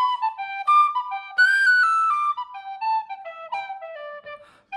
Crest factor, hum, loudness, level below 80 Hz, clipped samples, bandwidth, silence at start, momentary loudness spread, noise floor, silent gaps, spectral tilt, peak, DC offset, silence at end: 14 dB; none; -20 LUFS; -78 dBFS; under 0.1%; 11.5 kHz; 0 s; 20 LU; -43 dBFS; none; 1.5 dB/octave; -8 dBFS; under 0.1%; 0 s